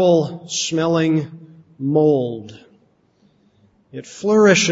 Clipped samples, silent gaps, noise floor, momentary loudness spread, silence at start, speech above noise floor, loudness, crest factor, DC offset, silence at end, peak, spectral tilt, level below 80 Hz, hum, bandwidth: under 0.1%; none; -58 dBFS; 21 LU; 0 s; 41 dB; -18 LUFS; 18 dB; under 0.1%; 0 s; -2 dBFS; -4.5 dB/octave; -62 dBFS; none; 8 kHz